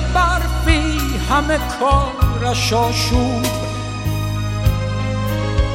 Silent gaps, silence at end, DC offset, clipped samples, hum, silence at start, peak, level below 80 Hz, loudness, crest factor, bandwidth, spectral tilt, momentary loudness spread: none; 0 s; under 0.1%; under 0.1%; none; 0 s; 0 dBFS; -22 dBFS; -18 LUFS; 16 dB; 16.5 kHz; -5 dB/octave; 5 LU